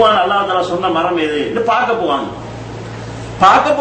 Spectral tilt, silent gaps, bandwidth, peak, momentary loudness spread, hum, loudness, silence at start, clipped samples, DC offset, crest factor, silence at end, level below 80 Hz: -5 dB/octave; none; 8.8 kHz; 0 dBFS; 18 LU; none; -14 LUFS; 0 s; under 0.1%; under 0.1%; 14 dB; 0 s; -42 dBFS